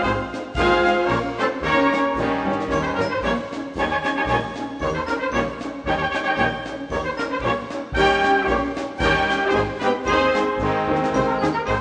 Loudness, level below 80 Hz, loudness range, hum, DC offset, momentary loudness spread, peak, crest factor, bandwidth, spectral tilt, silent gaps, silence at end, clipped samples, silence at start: -21 LUFS; -38 dBFS; 4 LU; none; under 0.1%; 8 LU; -6 dBFS; 16 dB; 10 kHz; -5.5 dB/octave; none; 0 s; under 0.1%; 0 s